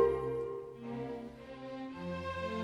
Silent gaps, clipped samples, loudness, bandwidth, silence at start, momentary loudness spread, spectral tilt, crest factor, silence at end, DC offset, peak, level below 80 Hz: none; under 0.1%; -40 LUFS; 11.5 kHz; 0 s; 9 LU; -7 dB/octave; 20 dB; 0 s; under 0.1%; -18 dBFS; -60 dBFS